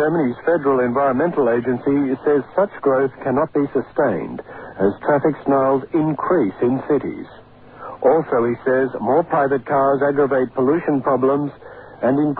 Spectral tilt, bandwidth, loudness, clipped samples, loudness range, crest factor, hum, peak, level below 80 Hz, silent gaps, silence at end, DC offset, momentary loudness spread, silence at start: -12 dB/octave; 4.4 kHz; -19 LUFS; under 0.1%; 2 LU; 14 dB; none; -4 dBFS; -56 dBFS; none; 0 s; 0.1%; 7 LU; 0 s